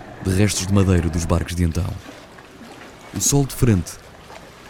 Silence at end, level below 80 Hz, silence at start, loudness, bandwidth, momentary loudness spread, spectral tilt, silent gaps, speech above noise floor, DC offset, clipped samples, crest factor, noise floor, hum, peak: 0 s; -36 dBFS; 0 s; -20 LUFS; 18 kHz; 22 LU; -5 dB/octave; none; 22 dB; under 0.1%; under 0.1%; 20 dB; -41 dBFS; none; -2 dBFS